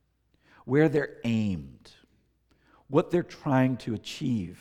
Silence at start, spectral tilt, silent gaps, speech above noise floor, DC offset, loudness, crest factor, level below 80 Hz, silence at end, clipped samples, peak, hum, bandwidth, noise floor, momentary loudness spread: 0.65 s; -7.5 dB/octave; none; 41 dB; under 0.1%; -28 LUFS; 20 dB; -60 dBFS; 0.05 s; under 0.1%; -10 dBFS; none; 13 kHz; -68 dBFS; 11 LU